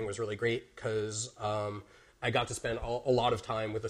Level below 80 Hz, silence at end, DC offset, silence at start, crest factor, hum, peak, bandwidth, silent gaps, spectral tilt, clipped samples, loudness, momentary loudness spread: -54 dBFS; 0 s; under 0.1%; 0 s; 18 dB; none; -14 dBFS; 13 kHz; none; -4.5 dB/octave; under 0.1%; -33 LUFS; 7 LU